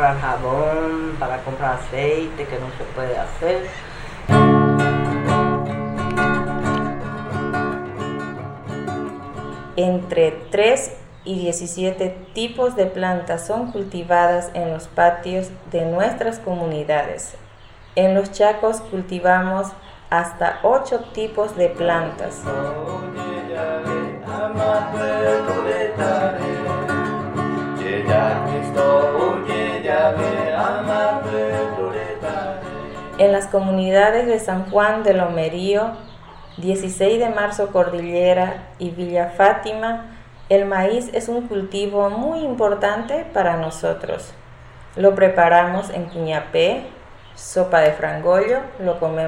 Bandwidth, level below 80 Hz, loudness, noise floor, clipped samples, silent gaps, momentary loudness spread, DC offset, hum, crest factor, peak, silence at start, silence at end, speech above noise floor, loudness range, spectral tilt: 12.5 kHz; -42 dBFS; -20 LUFS; -43 dBFS; under 0.1%; none; 12 LU; under 0.1%; none; 20 dB; 0 dBFS; 0 s; 0 s; 24 dB; 5 LU; -5.5 dB/octave